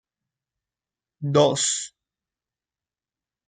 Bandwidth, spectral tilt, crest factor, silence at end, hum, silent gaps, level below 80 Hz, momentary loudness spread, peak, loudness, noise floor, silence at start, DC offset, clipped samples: 9.6 kHz; -4 dB/octave; 22 dB; 1.6 s; none; none; -66 dBFS; 15 LU; -6 dBFS; -21 LUFS; under -90 dBFS; 1.2 s; under 0.1%; under 0.1%